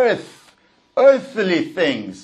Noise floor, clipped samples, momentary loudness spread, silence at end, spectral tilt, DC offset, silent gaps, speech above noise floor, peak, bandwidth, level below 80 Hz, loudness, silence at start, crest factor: -55 dBFS; under 0.1%; 10 LU; 0 s; -5.5 dB/octave; under 0.1%; none; 38 dB; -2 dBFS; 9.8 kHz; -66 dBFS; -18 LUFS; 0 s; 16 dB